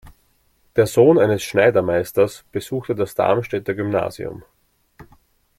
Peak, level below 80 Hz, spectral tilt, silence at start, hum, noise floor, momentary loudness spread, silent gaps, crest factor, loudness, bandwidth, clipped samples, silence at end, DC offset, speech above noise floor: -2 dBFS; -54 dBFS; -6 dB/octave; 0.05 s; none; -61 dBFS; 13 LU; none; 18 dB; -19 LUFS; 16 kHz; under 0.1%; 1.2 s; under 0.1%; 43 dB